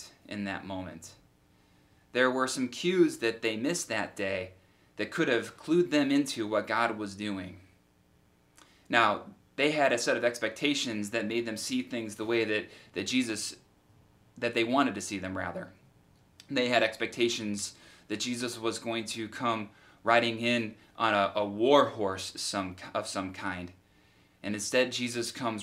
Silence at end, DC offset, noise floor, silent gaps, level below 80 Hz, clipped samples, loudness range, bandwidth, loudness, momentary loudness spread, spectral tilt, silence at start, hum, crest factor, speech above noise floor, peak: 0 s; under 0.1%; -65 dBFS; none; -74 dBFS; under 0.1%; 5 LU; 16 kHz; -30 LUFS; 12 LU; -3.5 dB/octave; 0 s; none; 24 dB; 35 dB; -6 dBFS